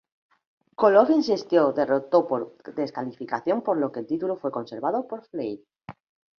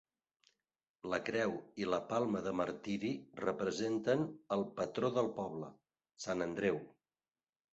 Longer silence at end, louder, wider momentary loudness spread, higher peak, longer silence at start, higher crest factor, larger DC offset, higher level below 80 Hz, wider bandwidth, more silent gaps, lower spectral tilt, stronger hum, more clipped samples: second, 0.45 s vs 0.85 s; first, -24 LUFS vs -38 LUFS; first, 15 LU vs 8 LU; first, -4 dBFS vs -18 dBFS; second, 0.8 s vs 1.05 s; about the same, 20 dB vs 20 dB; neither; about the same, -70 dBFS vs -72 dBFS; second, 6.8 kHz vs 8 kHz; neither; first, -6.5 dB/octave vs -5 dB/octave; neither; neither